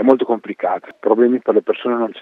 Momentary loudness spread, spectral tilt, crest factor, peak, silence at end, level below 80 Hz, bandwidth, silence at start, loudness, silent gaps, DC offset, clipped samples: 7 LU; -8 dB/octave; 16 dB; 0 dBFS; 0 s; -70 dBFS; 4.1 kHz; 0 s; -17 LUFS; none; under 0.1%; under 0.1%